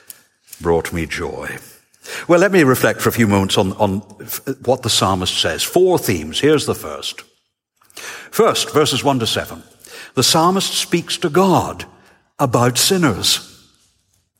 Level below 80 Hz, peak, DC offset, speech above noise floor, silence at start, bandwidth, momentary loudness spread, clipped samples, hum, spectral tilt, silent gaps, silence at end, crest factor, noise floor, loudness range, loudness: -46 dBFS; -2 dBFS; under 0.1%; 49 dB; 0.6 s; 17 kHz; 15 LU; under 0.1%; none; -4 dB/octave; none; 0.9 s; 16 dB; -66 dBFS; 3 LU; -16 LUFS